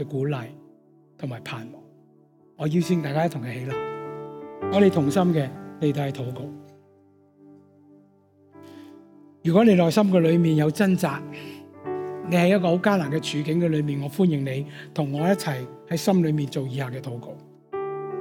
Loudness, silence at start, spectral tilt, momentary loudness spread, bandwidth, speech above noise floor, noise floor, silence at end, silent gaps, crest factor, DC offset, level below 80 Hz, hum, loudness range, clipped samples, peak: -24 LUFS; 0 s; -7 dB/octave; 18 LU; 17 kHz; 35 dB; -57 dBFS; 0 s; none; 18 dB; under 0.1%; -66 dBFS; none; 8 LU; under 0.1%; -6 dBFS